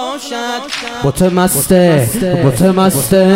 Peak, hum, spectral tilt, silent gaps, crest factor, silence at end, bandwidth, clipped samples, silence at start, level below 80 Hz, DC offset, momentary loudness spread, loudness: 0 dBFS; none; -5 dB/octave; none; 12 dB; 0 s; 16.5 kHz; 0.3%; 0 s; -36 dBFS; under 0.1%; 10 LU; -12 LUFS